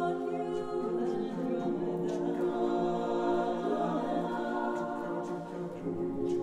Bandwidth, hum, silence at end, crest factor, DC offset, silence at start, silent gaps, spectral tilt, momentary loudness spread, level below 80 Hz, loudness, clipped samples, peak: 9.8 kHz; none; 0 s; 14 dB; under 0.1%; 0 s; none; -7.5 dB/octave; 5 LU; -62 dBFS; -33 LUFS; under 0.1%; -18 dBFS